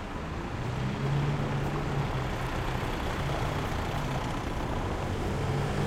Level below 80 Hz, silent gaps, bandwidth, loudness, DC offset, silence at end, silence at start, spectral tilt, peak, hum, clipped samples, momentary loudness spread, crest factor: -38 dBFS; none; 15.5 kHz; -32 LUFS; under 0.1%; 0 s; 0 s; -6.5 dB/octave; -18 dBFS; none; under 0.1%; 4 LU; 14 dB